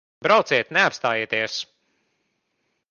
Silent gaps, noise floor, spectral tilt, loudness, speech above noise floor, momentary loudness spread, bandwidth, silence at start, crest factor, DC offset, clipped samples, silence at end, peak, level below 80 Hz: none; -74 dBFS; -3 dB/octave; -21 LUFS; 53 dB; 11 LU; 7.2 kHz; 0.2 s; 20 dB; under 0.1%; under 0.1%; 1.25 s; -4 dBFS; -70 dBFS